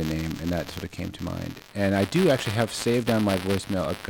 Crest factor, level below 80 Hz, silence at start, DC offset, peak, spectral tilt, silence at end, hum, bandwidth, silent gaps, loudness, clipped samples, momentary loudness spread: 16 dB; -48 dBFS; 0 s; under 0.1%; -10 dBFS; -5.5 dB/octave; 0 s; none; 19.5 kHz; none; -26 LUFS; under 0.1%; 12 LU